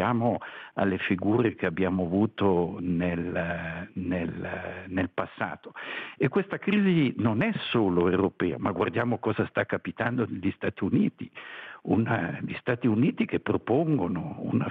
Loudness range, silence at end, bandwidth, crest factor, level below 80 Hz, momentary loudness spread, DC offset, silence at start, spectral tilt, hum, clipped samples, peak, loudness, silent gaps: 5 LU; 0 s; 4.7 kHz; 16 dB; -64 dBFS; 10 LU; under 0.1%; 0 s; -10 dB/octave; none; under 0.1%; -12 dBFS; -28 LUFS; none